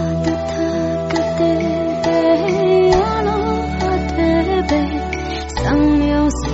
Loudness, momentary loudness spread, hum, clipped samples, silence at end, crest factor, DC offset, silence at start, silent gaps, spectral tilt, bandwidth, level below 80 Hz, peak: -17 LUFS; 6 LU; none; under 0.1%; 0 s; 14 dB; under 0.1%; 0 s; none; -5.5 dB/octave; 8 kHz; -28 dBFS; -2 dBFS